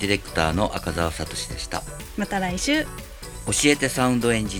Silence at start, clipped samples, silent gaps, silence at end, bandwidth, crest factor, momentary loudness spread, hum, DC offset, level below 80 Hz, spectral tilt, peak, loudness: 0 s; under 0.1%; none; 0 s; over 20 kHz; 20 dB; 14 LU; none; under 0.1%; -38 dBFS; -4 dB/octave; -4 dBFS; -23 LUFS